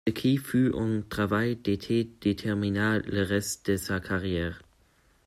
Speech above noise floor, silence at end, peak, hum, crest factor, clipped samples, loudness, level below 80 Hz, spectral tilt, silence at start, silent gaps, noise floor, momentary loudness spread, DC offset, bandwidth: 36 dB; 0.65 s; -12 dBFS; none; 16 dB; under 0.1%; -28 LUFS; -54 dBFS; -5.5 dB/octave; 0.05 s; none; -64 dBFS; 5 LU; under 0.1%; 16 kHz